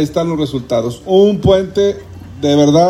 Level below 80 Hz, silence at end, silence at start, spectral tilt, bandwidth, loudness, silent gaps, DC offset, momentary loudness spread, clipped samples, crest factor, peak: -38 dBFS; 0 s; 0 s; -6.5 dB/octave; 12 kHz; -14 LUFS; none; under 0.1%; 9 LU; under 0.1%; 12 dB; 0 dBFS